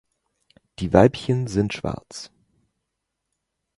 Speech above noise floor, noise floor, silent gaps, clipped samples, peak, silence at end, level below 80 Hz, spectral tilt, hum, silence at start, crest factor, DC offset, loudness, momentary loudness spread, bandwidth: 59 dB; -80 dBFS; none; under 0.1%; 0 dBFS; 1.5 s; -46 dBFS; -7 dB/octave; none; 0.8 s; 24 dB; under 0.1%; -21 LUFS; 21 LU; 11.5 kHz